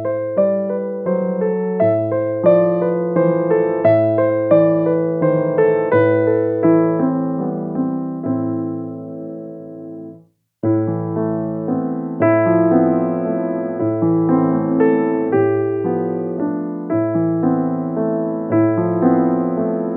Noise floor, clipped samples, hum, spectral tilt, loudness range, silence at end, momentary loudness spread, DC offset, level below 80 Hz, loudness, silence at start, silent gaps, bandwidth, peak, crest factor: -47 dBFS; under 0.1%; none; -12.5 dB/octave; 8 LU; 0 s; 9 LU; under 0.1%; -66 dBFS; -17 LUFS; 0 s; none; 3.8 kHz; -2 dBFS; 16 dB